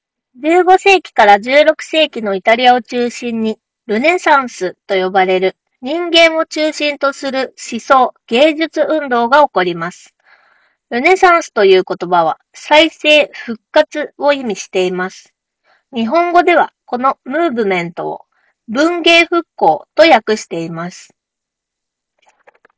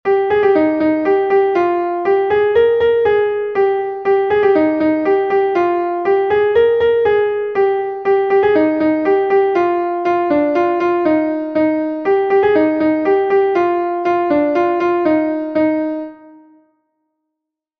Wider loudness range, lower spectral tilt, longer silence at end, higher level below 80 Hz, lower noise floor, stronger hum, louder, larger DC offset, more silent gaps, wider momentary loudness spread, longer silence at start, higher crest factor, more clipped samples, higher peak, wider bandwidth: about the same, 4 LU vs 2 LU; second, -4 dB/octave vs -7.5 dB/octave; about the same, 1.75 s vs 1.65 s; second, -58 dBFS vs -52 dBFS; about the same, -80 dBFS vs -80 dBFS; neither; first, -12 LUFS vs -15 LUFS; neither; neither; first, 13 LU vs 4 LU; first, 0.4 s vs 0.05 s; about the same, 14 dB vs 12 dB; first, 0.5% vs under 0.1%; about the same, 0 dBFS vs -2 dBFS; first, 8 kHz vs 5.8 kHz